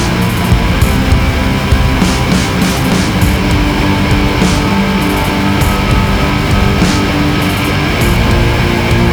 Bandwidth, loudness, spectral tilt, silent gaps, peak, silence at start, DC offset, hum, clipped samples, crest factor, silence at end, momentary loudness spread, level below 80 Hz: over 20 kHz; -11 LUFS; -5.5 dB/octave; none; 0 dBFS; 0 s; under 0.1%; none; under 0.1%; 10 dB; 0 s; 2 LU; -18 dBFS